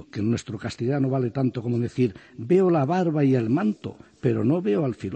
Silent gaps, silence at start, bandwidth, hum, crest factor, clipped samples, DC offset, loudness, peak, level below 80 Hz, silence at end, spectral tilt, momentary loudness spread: none; 0.15 s; 8.6 kHz; none; 14 dB; under 0.1%; under 0.1%; -24 LUFS; -8 dBFS; -62 dBFS; 0 s; -8.5 dB/octave; 8 LU